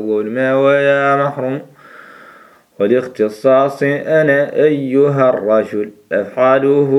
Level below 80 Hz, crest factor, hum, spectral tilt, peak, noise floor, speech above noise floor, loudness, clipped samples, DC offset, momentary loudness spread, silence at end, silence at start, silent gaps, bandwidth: -66 dBFS; 14 dB; none; -7.5 dB/octave; 0 dBFS; -44 dBFS; 30 dB; -14 LUFS; under 0.1%; under 0.1%; 8 LU; 0 s; 0 s; none; 12 kHz